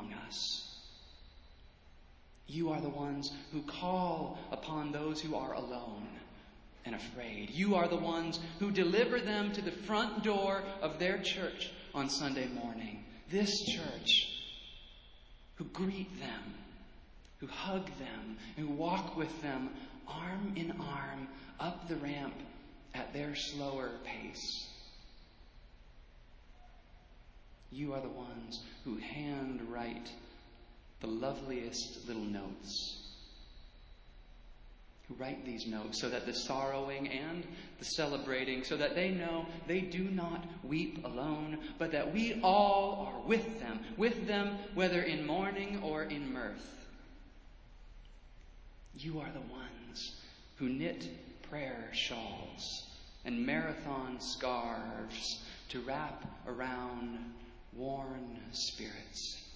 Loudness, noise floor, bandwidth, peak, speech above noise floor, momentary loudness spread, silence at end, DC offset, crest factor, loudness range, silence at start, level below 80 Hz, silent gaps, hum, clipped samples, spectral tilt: -38 LUFS; -59 dBFS; 8 kHz; -16 dBFS; 21 dB; 16 LU; 0 s; under 0.1%; 24 dB; 11 LU; 0 s; -58 dBFS; none; none; under 0.1%; -4.5 dB/octave